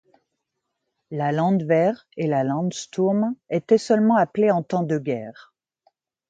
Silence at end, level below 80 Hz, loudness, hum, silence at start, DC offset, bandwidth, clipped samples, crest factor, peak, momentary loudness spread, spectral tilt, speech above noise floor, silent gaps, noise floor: 1 s; -70 dBFS; -22 LUFS; none; 1.1 s; under 0.1%; 9.2 kHz; under 0.1%; 18 dB; -4 dBFS; 9 LU; -7 dB/octave; 58 dB; none; -79 dBFS